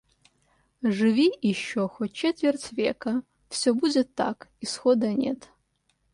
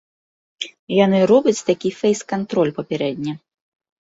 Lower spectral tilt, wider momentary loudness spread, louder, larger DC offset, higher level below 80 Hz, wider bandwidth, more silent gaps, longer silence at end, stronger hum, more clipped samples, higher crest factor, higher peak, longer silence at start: about the same, -5 dB/octave vs -5.5 dB/octave; second, 9 LU vs 16 LU; second, -26 LUFS vs -19 LUFS; neither; about the same, -66 dBFS vs -62 dBFS; first, 11.5 kHz vs 8 kHz; second, none vs 0.79-0.87 s; about the same, 0.8 s vs 0.8 s; neither; neither; about the same, 16 dB vs 18 dB; second, -10 dBFS vs -2 dBFS; first, 0.8 s vs 0.6 s